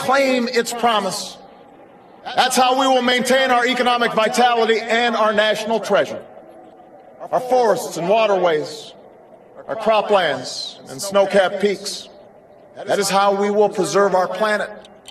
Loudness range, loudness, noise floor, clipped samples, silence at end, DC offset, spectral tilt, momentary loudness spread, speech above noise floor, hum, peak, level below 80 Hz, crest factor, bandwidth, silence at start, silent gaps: 4 LU; -17 LUFS; -45 dBFS; under 0.1%; 0.3 s; under 0.1%; -3 dB/octave; 14 LU; 28 dB; none; -2 dBFS; -64 dBFS; 18 dB; 13 kHz; 0 s; none